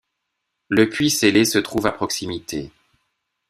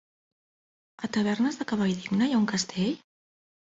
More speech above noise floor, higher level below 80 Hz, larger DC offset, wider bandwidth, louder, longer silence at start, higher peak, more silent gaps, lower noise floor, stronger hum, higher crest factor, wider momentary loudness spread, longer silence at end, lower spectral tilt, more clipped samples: second, 58 dB vs over 63 dB; first, -52 dBFS vs -66 dBFS; neither; first, 16 kHz vs 8 kHz; first, -19 LUFS vs -27 LUFS; second, 0.7 s vs 1 s; first, -2 dBFS vs -12 dBFS; neither; second, -77 dBFS vs under -90 dBFS; neither; about the same, 20 dB vs 16 dB; first, 14 LU vs 7 LU; about the same, 0.8 s vs 0.8 s; second, -3.5 dB/octave vs -5 dB/octave; neither